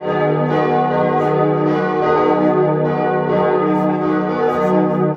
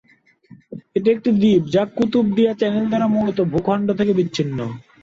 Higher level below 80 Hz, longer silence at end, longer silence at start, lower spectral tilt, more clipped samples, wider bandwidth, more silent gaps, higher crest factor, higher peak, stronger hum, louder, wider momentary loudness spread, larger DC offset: about the same, -54 dBFS vs -52 dBFS; second, 0 s vs 0.2 s; second, 0 s vs 0.7 s; first, -9 dB/octave vs -7.5 dB/octave; neither; second, 6.8 kHz vs 7.6 kHz; neither; about the same, 14 dB vs 14 dB; first, -2 dBFS vs -6 dBFS; neither; first, -16 LUFS vs -19 LUFS; second, 3 LU vs 10 LU; neither